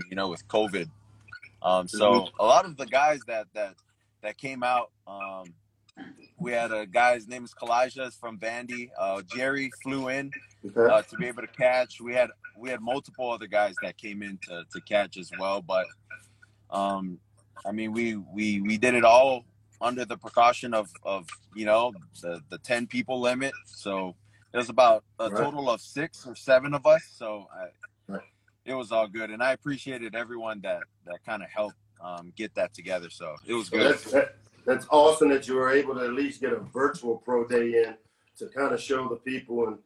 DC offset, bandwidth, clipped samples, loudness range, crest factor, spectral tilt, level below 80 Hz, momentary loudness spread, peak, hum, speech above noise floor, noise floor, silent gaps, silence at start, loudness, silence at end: under 0.1%; 12 kHz; under 0.1%; 8 LU; 20 dB; -4.5 dB/octave; -66 dBFS; 17 LU; -6 dBFS; none; 32 dB; -59 dBFS; none; 0 s; -27 LUFS; 0.1 s